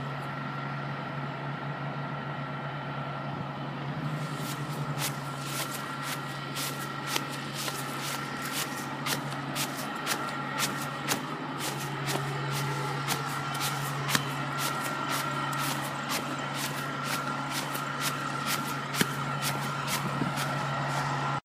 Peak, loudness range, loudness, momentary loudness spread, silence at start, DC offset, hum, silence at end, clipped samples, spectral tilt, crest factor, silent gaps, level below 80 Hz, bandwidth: -6 dBFS; 5 LU; -32 LUFS; 5 LU; 0 s; under 0.1%; none; 0.05 s; under 0.1%; -3.5 dB/octave; 26 dB; none; -64 dBFS; 15.5 kHz